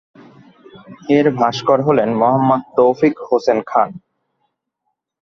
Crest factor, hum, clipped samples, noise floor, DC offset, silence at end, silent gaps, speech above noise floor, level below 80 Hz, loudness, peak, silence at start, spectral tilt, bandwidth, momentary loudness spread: 16 dB; none; under 0.1%; -74 dBFS; under 0.1%; 1.25 s; none; 60 dB; -58 dBFS; -15 LUFS; 0 dBFS; 0.75 s; -7 dB/octave; 7.2 kHz; 4 LU